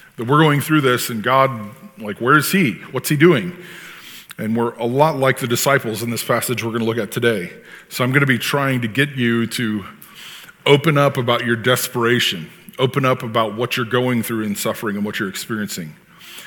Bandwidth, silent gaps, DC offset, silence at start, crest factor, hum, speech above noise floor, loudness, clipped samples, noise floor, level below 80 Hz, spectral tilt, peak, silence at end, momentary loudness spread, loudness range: 19.5 kHz; none; under 0.1%; 0.2 s; 18 dB; none; 21 dB; -18 LUFS; under 0.1%; -39 dBFS; -64 dBFS; -5 dB/octave; 0 dBFS; 0 s; 18 LU; 3 LU